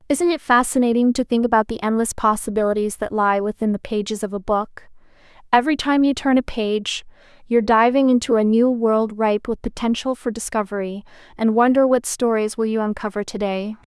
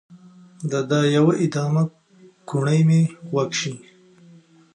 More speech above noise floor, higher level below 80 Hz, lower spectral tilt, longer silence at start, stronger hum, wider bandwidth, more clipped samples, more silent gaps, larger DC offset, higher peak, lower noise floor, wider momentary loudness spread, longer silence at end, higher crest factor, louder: about the same, 28 dB vs 31 dB; first, -46 dBFS vs -68 dBFS; second, -4.5 dB/octave vs -6.5 dB/octave; about the same, 0.1 s vs 0.1 s; neither; first, 12 kHz vs 10 kHz; neither; neither; neither; first, -2 dBFS vs -6 dBFS; about the same, -47 dBFS vs -50 dBFS; about the same, 9 LU vs 11 LU; second, 0.15 s vs 0.95 s; about the same, 18 dB vs 16 dB; about the same, -19 LUFS vs -21 LUFS